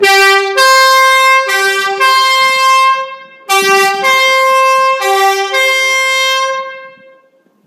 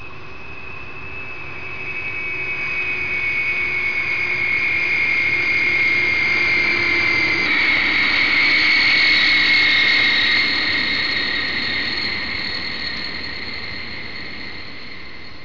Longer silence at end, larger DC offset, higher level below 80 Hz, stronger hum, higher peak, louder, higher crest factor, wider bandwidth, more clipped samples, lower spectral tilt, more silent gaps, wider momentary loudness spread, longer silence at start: first, 0.75 s vs 0 s; second, under 0.1% vs 3%; second, -64 dBFS vs -46 dBFS; neither; first, 0 dBFS vs -8 dBFS; first, -8 LUFS vs -16 LUFS; about the same, 10 dB vs 12 dB; first, 16.5 kHz vs 5.4 kHz; first, 0.2% vs under 0.1%; second, 0.5 dB/octave vs -3 dB/octave; neither; second, 7 LU vs 19 LU; about the same, 0 s vs 0 s